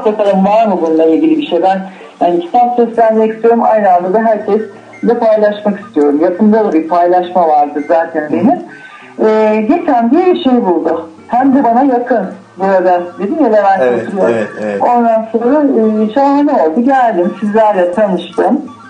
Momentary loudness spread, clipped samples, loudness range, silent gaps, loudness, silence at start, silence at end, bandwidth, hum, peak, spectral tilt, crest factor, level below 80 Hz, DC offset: 6 LU; under 0.1%; 1 LU; none; -11 LUFS; 0 s; 0 s; 9.4 kHz; none; 0 dBFS; -8 dB/octave; 10 dB; -58 dBFS; under 0.1%